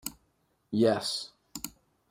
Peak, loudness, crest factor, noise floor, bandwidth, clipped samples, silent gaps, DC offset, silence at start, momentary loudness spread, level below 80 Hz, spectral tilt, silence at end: -12 dBFS; -31 LUFS; 20 dB; -73 dBFS; 16 kHz; under 0.1%; none; under 0.1%; 0.05 s; 16 LU; -66 dBFS; -4.5 dB/octave; 0.4 s